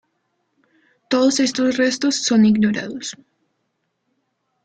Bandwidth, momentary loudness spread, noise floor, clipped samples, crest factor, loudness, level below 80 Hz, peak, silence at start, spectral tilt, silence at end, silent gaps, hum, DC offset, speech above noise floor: 9.2 kHz; 13 LU; -72 dBFS; under 0.1%; 16 dB; -18 LUFS; -62 dBFS; -6 dBFS; 1.1 s; -4 dB/octave; 1.55 s; none; none; under 0.1%; 55 dB